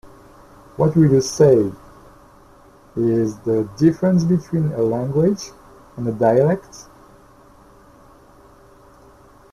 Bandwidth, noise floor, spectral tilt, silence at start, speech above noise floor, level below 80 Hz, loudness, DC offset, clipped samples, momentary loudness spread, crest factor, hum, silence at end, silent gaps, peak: 13.5 kHz; -48 dBFS; -7.5 dB/octave; 0.05 s; 31 dB; -50 dBFS; -18 LUFS; under 0.1%; under 0.1%; 17 LU; 18 dB; none; 2.7 s; none; -2 dBFS